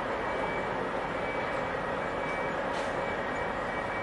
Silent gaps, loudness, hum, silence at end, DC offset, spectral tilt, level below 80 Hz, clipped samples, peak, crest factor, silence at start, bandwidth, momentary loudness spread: none; -32 LUFS; none; 0 s; under 0.1%; -5.5 dB/octave; -52 dBFS; under 0.1%; -20 dBFS; 12 dB; 0 s; 11.5 kHz; 1 LU